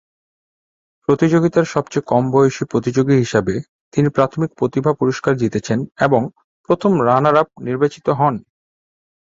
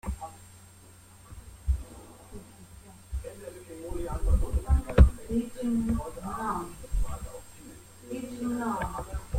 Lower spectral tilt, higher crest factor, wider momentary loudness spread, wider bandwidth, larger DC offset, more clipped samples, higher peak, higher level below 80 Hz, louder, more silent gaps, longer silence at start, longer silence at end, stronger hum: about the same, -7 dB/octave vs -7 dB/octave; second, 16 dB vs 26 dB; second, 8 LU vs 22 LU; second, 7.8 kHz vs 16 kHz; neither; neither; about the same, -2 dBFS vs -4 dBFS; second, -52 dBFS vs -32 dBFS; first, -17 LUFS vs -31 LUFS; first, 3.69-3.91 s, 6.44-6.64 s vs none; first, 1.1 s vs 0.05 s; first, 0.95 s vs 0 s; neither